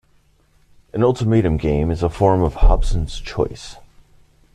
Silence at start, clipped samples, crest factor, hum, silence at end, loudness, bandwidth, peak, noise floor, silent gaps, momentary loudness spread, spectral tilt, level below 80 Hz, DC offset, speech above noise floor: 0.95 s; under 0.1%; 16 dB; none; 0.8 s; -19 LUFS; 10 kHz; -2 dBFS; -57 dBFS; none; 10 LU; -7.5 dB/octave; -22 dBFS; under 0.1%; 40 dB